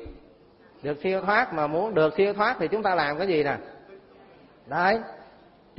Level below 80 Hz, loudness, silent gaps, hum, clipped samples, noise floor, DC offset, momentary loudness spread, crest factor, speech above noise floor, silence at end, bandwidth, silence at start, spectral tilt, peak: -58 dBFS; -25 LUFS; none; none; under 0.1%; -54 dBFS; under 0.1%; 11 LU; 20 dB; 30 dB; 0.55 s; 5.8 kHz; 0 s; -9.5 dB/octave; -8 dBFS